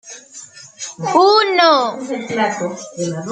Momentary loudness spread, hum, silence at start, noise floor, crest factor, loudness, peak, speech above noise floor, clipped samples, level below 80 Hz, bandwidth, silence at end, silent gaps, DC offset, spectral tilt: 22 LU; none; 0.05 s; -39 dBFS; 16 dB; -15 LUFS; 0 dBFS; 23 dB; under 0.1%; -66 dBFS; 9.4 kHz; 0 s; none; under 0.1%; -3.5 dB/octave